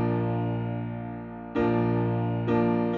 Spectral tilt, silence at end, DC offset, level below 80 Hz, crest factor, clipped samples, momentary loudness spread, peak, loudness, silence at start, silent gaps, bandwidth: -8.5 dB/octave; 0 s; under 0.1%; -52 dBFS; 14 dB; under 0.1%; 11 LU; -12 dBFS; -27 LUFS; 0 s; none; 4.4 kHz